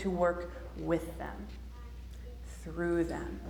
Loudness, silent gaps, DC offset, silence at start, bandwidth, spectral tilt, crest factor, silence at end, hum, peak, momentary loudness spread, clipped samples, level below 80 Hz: -36 LUFS; none; under 0.1%; 0 s; 19.5 kHz; -7 dB/octave; 20 dB; 0 s; none; -16 dBFS; 16 LU; under 0.1%; -46 dBFS